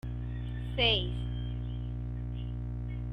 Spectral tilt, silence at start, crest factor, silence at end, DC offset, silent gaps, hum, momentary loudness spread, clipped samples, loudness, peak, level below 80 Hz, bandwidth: -7 dB/octave; 0.05 s; 20 dB; 0 s; under 0.1%; none; 60 Hz at -35 dBFS; 11 LU; under 0.1%; -34 LUFS; -14 dBFS; -38 dBFS; 5.6 kHz